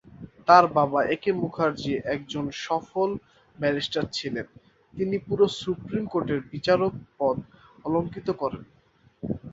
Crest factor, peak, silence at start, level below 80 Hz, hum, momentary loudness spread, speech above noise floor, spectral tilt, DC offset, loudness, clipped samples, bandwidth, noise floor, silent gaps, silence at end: 24 dB; -2 dBFS; 0.15 s; -56 dBFS; none; 12 LU; 23 dB; -6 dB/octave; under 0.1%; -26 LUFS; under 0.1%; 8 kHz; -48 dBFS; none; 0 s